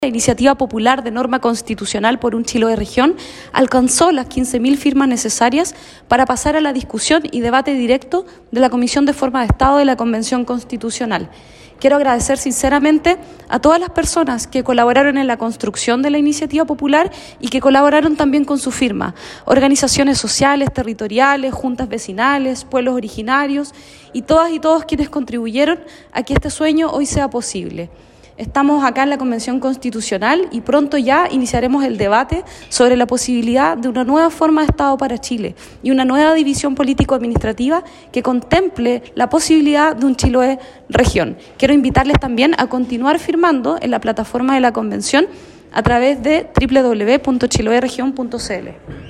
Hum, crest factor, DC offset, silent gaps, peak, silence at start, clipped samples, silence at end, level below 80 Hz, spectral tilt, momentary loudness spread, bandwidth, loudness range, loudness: none; 14 dB; under 0.1%; none; 0 dBFS; 0 s; under 0.1%; 0 s; -34 dBFS; -4.5 dB/octave; 9 LU; 13 kHz; 3 LU; -15 LUFS